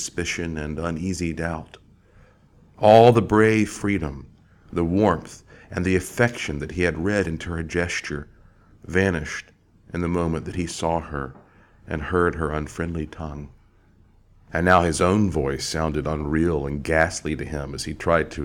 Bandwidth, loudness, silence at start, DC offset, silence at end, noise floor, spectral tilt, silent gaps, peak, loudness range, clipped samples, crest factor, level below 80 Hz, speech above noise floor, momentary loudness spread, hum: 16.5 kHz; -23 LUFS; 0 s; under 0.1%; 0 s; -55 dBFS; -5.5 dB/octave; none; -2 dBFS; 8 LU; under 0.1%; 22 dB; -40 dBFS; 33 dB; 15 LU; none